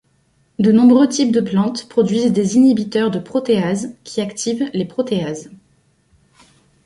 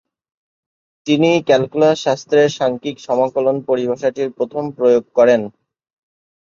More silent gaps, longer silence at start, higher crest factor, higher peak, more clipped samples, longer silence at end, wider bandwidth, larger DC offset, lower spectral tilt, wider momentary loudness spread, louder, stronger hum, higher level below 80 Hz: neither; second, 0.6 s vs 1.05 s; about the same, 14 dB vs 16 dB; about the same, -2 dBFS vs 0 dBFS; neither; first, 1.3 s vs 1 s; first, 11.5 kHz vs 7.4 kHz; neither; about the same, -6 dB/octave vs -5.5 dB/octave; first, 12 LU vs 9 LU; about the same, -16 LUFS vs -16 LUFS; neither; about the same, -58 dBFS vs -62 dBFS